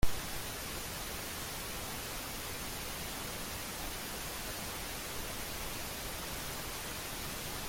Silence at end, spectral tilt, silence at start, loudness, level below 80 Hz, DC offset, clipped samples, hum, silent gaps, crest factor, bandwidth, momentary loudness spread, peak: 0 s; -2.5 dB/octave; 0 s; -40 LUFS; -48 dBFS; under 0.1%; under 0.1%; none; none; 22 dB; 17 kHz; 0 LU; -16 dBFS